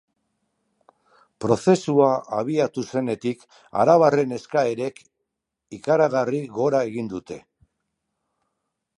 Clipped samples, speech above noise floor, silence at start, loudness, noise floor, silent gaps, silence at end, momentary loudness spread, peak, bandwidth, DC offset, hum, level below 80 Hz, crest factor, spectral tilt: under 0.1%; 60 dB; 1.4 s; -22 LUFS; -81 dBFS; none; 1.6 s; 14 LU; -2 dBFS; 11 kHz; under 0.1%; none; -64 dBFS; 20 dB; -6.5 dB/octave